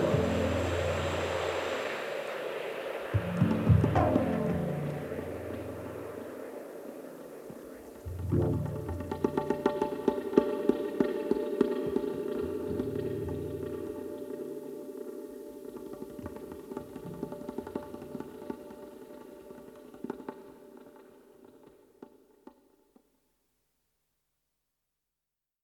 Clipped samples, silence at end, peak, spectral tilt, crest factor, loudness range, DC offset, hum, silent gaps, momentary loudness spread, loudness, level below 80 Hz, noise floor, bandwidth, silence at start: under 0.1%; 3.55 s; -6 dBFS; -7 dB/octave; 28 dB; 16 LU; under 0.1%; none; none; 17 LU; -33 LUFS; -52 dBFS; -89 dBFS; 16.5 kHz; 0 s